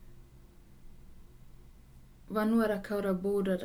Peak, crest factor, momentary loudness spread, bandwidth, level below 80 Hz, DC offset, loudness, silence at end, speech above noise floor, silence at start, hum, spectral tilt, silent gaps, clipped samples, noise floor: -18 dBFS; 16 dB; 5 LU; 17 kHz; -54 dBFS; under 0.1%; -31 LUFS; 0 s; 25 dB; 0 s; none; -7.5 dB/octave; none; under 0.1%; -55 dBFS